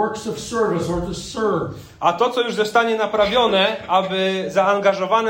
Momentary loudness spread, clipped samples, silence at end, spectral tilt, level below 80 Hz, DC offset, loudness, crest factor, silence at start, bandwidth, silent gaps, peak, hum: 8 LU; under 0.1%; 0 s; -4.5 dB/octave; -46 dBFS; under 0.1%; -19 LUFS; 16 dB; 0 s; 16.5 kHz; none; -4 dBFS; none